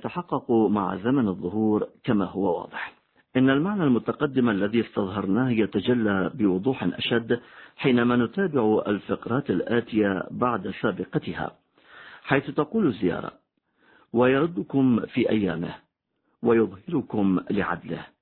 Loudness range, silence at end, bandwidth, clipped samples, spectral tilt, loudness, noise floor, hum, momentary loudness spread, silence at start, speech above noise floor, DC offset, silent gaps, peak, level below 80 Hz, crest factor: 3 LU; 0.15 s; 4.4 kHz; under 0.1%; -11 dB/octave; -25 LUFS; -73 dBFS; none; 8 LU; 0 s; 49 dB; under 0.1%; none; -4 dBFS; -58 dBFS; 20 dB